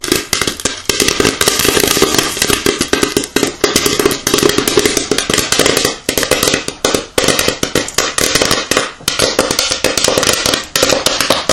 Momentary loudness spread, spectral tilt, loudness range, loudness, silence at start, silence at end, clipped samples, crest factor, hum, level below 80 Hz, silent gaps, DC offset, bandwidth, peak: 4 LU; -2 dB/octave; 1 LU; -12 LUFS; 0 s; 0 s; 0.5%; 14 dB; none; -36 dBFS; none; under 0.1%; over 20 kHz; 0 dBFS